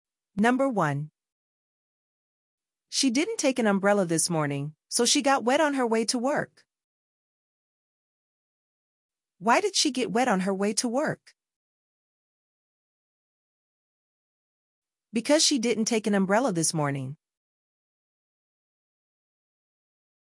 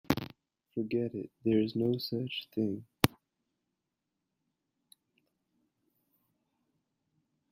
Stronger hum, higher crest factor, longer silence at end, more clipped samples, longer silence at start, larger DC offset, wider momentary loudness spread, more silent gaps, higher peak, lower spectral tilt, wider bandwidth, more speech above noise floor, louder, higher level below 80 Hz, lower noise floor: neither; second, 20 dB vs 36 dB; second, 3.25 s vs 4.45 s; neither; first, 0.35 s vs 0.1 s; neither; about the same, 10 LU vs 8 LU; first, 1.32-2.58 s, 6.84-9.09 s, 11.56-14.82 s vs none; second, -8 dBFS vs 0 dBFS; second, -3.5 dB/octave vs -6 dB/octave; second, 12 kHz vs 16 kHz; first, over 65 dB vs 53 dB; first, -25 LUFS vs -33 LUFS; second, -78 dBFS vs -64 dBFS; first, under -90 dBFS vs -86 dBFS